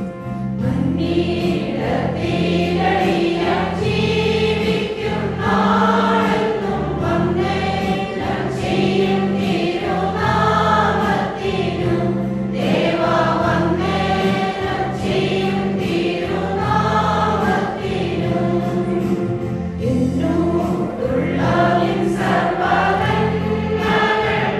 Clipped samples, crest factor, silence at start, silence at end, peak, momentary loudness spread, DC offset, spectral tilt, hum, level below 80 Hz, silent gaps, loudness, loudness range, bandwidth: under 0.1%; 16 dB; 0 s; 0 s; -2 dBFS; 5 LU; under 0.1%; -7 dB/octave; none; -42 dBFS; none; -18 LUFS; 2 LU; 13 kHz